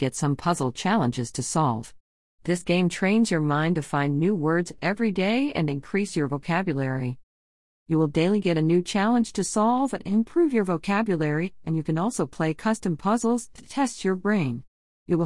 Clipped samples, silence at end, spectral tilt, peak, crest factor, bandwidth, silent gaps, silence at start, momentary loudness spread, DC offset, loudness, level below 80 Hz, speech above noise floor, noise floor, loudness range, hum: under 0.1%; 0 s; -6 dB/octave; -8 dBFS; 16 dB; 12 kHz; 2.00-2.38 s, 7.23-7.86 s, 14.68-15.06 s; 0 s; 6 LU; 0.4%; -25 LUFS; -56 dBFS; over 66 dB; under -90 dBFS; 3 LU; none